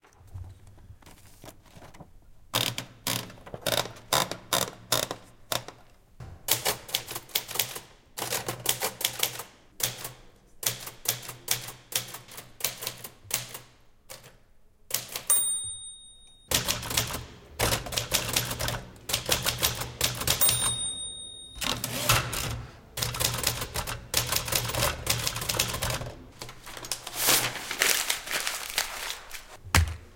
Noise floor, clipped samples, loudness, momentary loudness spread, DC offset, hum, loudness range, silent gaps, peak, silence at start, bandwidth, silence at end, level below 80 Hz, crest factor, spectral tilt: -56 dBFS; under 0.1%; -28 LUFS; 18 LU; under 0.1%; none; 6 LU; none; -4 dBFS; 0.2 s; 17 kHz; 0 s; -48 dBFS; 28 dB; -1.5 dB/octave